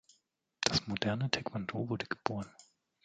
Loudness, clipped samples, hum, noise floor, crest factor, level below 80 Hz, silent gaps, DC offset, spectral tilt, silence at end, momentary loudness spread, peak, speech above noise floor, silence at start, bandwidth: -35 LUFS; under 0.1%; none; -77 dBFS; 30 dB; -62 dBFS; none; under 0.1%; -4 dB/octave; 0.45 s; 7 LU; -8 dBFS; 41 dB; 0.6 s; 9.4 kHz